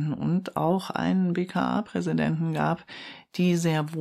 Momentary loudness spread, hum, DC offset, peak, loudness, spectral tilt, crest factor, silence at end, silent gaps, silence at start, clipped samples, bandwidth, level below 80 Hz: 6 LU; none; under 0.1%; -12 dBFS; -26 LUFS; -7 dB/octave; 14 dB; 0 s; none; 0 s; under 0.1%; 14 kHz; -62 dBFS